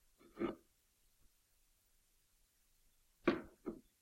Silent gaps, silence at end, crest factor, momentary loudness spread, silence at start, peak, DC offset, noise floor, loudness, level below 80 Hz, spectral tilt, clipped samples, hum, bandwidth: none; 0.2 s; 28 dB; 17 LU; 0.35 s; -20 dBFS; under 0.1%; -76 dBFS; -43 LUFS; -72 dBFS; -6.5 dB/octave; under 0.1%; none; 16 kHz